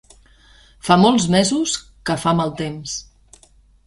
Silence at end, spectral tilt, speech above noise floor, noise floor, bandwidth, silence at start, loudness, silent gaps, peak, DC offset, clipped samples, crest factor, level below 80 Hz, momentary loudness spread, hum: 0.85 s; -4.5 dB/octave; 35 dB; -52 dBFS; 11.5 kHz; 0.85 s; -18 LUFS; none; -2 dBFS; under 0.1%; under 0.1%; 20 dB; -48 dBFS; 15 LU; none